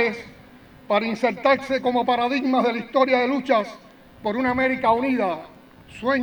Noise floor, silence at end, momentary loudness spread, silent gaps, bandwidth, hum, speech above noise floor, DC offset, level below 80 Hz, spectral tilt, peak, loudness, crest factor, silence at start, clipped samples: -47 dBFS; 0 s; 8 LU; none; 19.5 kHz; none; 26 dB; under 0.1%; -56 dBFS; -5.5 dB/octave; -6 dBFS; -22 LUFS; 16 dB; 0 s; under 0.1%